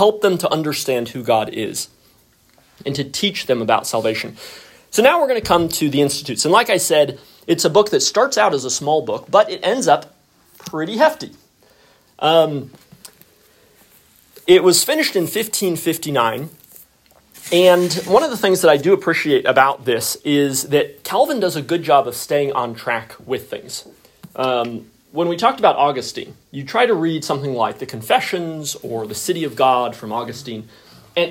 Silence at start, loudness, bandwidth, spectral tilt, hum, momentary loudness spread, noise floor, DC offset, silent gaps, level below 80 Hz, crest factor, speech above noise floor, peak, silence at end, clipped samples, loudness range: 0 s; -17 LUFS; 16.5 kHz; -3.5 dB/octave; none; 15 LU; -55 dBFS; under 0.1%; none; -58 dBFS; 18 dB; 37 dB; 0 dBFS; 0 s; under 0.1%; 6 LU